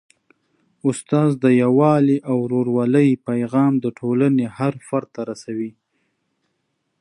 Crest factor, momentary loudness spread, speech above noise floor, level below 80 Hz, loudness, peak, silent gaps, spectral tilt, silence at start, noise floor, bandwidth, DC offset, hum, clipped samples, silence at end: 16 dB; 13 LU; 54 dB; -68 dBFS; -19 LUFS; -4 dBFS; none; -8 dB/octave; 0.85 s; -72 dBFS; 11 kHz; under 0.1%; none; under 0.1%; 1.3 s